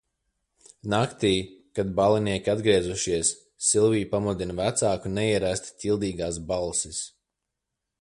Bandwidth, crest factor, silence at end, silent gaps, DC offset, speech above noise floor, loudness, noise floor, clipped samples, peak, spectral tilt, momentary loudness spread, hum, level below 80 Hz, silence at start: 11.5 kHz; 20 dB; 0.9 s; none; under 0.1%; 59 dB; -25 LUFS; -84 dBFS; under 0.1%; -8 dBFS; -4 dB/octave; 8 LU; none; -50 dBFS; 0.85 s